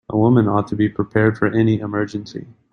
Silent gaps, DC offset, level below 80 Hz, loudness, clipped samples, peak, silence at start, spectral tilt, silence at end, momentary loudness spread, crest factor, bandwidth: none; under 0.1%; -50 dBFS; -18 LUFS; under 0.1%; -2 dBFS; 0.1 s; -9 dB/octave; 0.2 s; 13 LU; 16 dB; 7 kHz